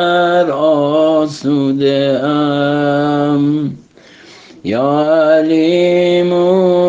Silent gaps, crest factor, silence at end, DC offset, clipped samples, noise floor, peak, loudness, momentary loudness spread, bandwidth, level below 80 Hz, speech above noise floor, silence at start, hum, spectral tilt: none; 12 dB; 0 s; under 0.1%; under 0.1%; -41 dBFS; 0 dBFS; -13 LUFS; 5 LU; 7.8 kHz; -58 dBFS; 29 dB; 0 s; none; -7 dB/octave